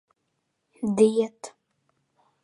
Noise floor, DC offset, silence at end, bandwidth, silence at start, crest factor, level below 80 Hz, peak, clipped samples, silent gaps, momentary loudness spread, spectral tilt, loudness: -77 dBFS; under 0.1%; 0.95 s; 11.5 kHz; 0.8 s; 22 dB; -70 dBFS; -6 dBFS; under 0.1%; none; 23 LU; -6.5 dB/octave; -24 LUFS